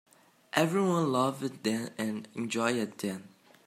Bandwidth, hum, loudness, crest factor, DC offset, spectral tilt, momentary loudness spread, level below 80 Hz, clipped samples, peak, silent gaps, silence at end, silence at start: 16 kHz; none; -31 LUFS; 26 dB; under 0.1%; -5 dB/octave; 10 LU; -76 dBFS; under 0.1%; -6 dBFS; none; 0.4 s; 0.55 s